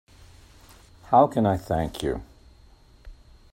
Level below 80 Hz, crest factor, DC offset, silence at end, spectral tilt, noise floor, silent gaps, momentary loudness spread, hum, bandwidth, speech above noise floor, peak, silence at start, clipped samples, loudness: -46 dBFS; 22 dB; under 0.1%; 0.4 s; -7 dB/octave; -53 dBFS; none; 11 LU; none; 16 kHz; 31 dB; -4 dBFS; 1.1 s; under 0.1%; -24 LUFS